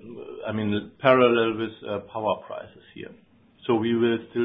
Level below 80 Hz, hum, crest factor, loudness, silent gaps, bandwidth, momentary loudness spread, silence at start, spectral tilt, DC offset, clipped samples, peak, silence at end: -62 dBFS; none; 22 dB; -24 LUFS; none; 4.9 kHz; 24 LU; 0.05 s; -10.5 dB/octave; under 0.1%; under 0.1%; -2 dBFS; 0 s